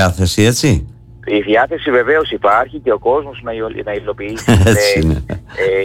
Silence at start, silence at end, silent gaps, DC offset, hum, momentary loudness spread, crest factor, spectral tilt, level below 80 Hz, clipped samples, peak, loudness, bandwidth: 0 s; 0 s; none; under 0.1%; none; 11 LU; 12 dB; -5 dB/octave; -30 dBFS; under 0.1%; -2 dBFS; -14 LUFS; 16.5 kHz